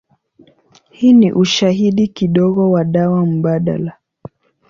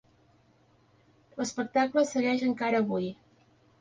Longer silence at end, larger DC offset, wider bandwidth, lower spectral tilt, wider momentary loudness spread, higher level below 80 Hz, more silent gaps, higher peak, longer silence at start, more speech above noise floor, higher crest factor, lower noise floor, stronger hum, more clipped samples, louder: first, 0.8 s vs 0.65 s; neither; second, 7.4 kHz vs 9.6 kHz; first, -6.5 dB/octave vs -5 dB/octave; about the same, 7 LU vs 9 LU; first, -52 dBFS vs -70 dBFS; neither; first, -2 dBFS vs -12 dBFS; second, 1 s vs 1.35 s; about the same, 38 dB vs 36 dB; second, 12 dB vs 18 dB; second, -50 dBFS vs -64 dBFS; neither; neither; first, -14 LUFS vs -29 LUFS